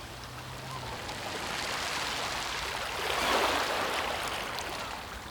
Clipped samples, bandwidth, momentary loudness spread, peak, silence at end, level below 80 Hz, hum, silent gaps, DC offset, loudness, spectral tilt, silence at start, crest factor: under 0.1%; 19.5 kHz; 12 LU; -14 dBFS; 0 s; -52 dBFS; none; none; under 0.1%; -32 LUFS; -2 dB/octave; 0 s; 18 dB